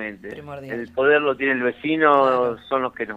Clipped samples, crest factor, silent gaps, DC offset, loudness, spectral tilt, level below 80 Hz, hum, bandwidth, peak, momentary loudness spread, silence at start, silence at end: under 0.1%; 18 dB; none; under 0.1%; -20 LUFS; -7 dB/octave; -60 dBFS; none; 7.8 kHz; -2 dBFS; 16 LU; 0 s; 0 s